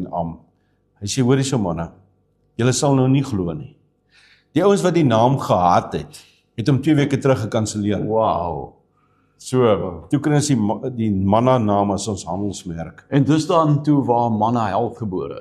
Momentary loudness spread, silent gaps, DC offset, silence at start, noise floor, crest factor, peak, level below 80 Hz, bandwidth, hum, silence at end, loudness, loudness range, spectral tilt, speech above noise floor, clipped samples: 13 LU; none; under 0.1%; 0 s; -62 dBFS; 16 dB; -2 dBFS; -50 dBFS; 13 kHz; none; 0 s; -19 LUFS; 3 LU; -6.5 dB/octave; 44 dB; under 0.1%